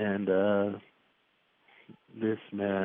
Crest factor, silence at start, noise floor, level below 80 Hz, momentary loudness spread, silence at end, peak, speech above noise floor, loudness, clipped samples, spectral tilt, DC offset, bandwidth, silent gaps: 16 dB; 0 s; -71 dBFS; -84 dBFS; 14 LU; 0 s; -16 dBFS; 42 dB; -30 LUFS; under 0.1%; -6 dB/octave; under 0.1%; 3.8 kHz; none